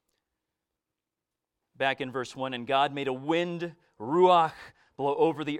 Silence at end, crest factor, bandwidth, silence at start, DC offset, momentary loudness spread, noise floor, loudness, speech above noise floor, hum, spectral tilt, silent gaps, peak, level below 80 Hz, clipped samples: 0 s; 20 dB; 11 kHz; 1.8 s; under 0.1%; 13 LU; -88 dBFS; -27 LUFS; 61 dB; none; -6 dB/octave; none; -8 dBFS; -74 dBFS; under 0.1%